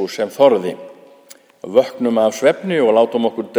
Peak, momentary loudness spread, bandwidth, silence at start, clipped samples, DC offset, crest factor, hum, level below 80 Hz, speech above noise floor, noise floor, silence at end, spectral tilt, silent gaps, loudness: 0 dBFS; 10 LU; over 20 kHz; 0 s; under 0.1%; under 0.1%; 16 dB; none; -72 dBFS; 30 dB; -46 dBFS; 0 s; -5 dB/octave; none; -16 LUFS